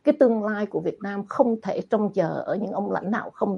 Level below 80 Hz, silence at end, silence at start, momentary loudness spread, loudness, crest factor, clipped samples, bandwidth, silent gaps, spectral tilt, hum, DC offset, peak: -68 dBFS; 0 s; 0.05 s; 8 LU; -25 LUFS; 18 dB; under 0.1%; 7 kHz; none; -8.5 dB/octave; none; under 0.1%; -6 dBFS